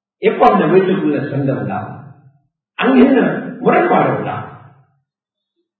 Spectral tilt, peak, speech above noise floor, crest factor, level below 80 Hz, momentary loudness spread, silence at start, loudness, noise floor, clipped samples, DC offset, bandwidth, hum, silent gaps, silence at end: -9.5 dB/octave; 0 dBFS; 68 dB; 16 dB; -54 dBFS; 15 LU; 0.2 s; -14 LUFS; -81 dBFS; under 0.1%; under 0.1%; 4.7 kHz; none; none; 1.2 s